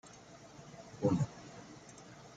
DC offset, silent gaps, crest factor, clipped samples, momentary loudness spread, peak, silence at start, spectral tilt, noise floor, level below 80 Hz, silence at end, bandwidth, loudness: under 0.1%; none; 22 dB; under 0.1%; 21 LU; -18 dBFS; 0.05 s; -7 dB/octave; -56 dBFS; -68 dBFS; 0.1 s; 9.2 kHz; -36 LUFS